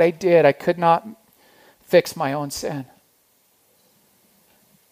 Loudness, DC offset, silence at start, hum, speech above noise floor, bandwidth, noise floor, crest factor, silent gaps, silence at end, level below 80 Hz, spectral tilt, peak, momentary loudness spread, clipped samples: -19 LUFS; under 0.1%; 0 s; none; 43 dB; 15.5 kHz; -62 dBFS; 20 dB; none; 2.05 s; -64 dBFS; -5.5 dB/octave; -2 dBFS; 17 LU; under 0.1%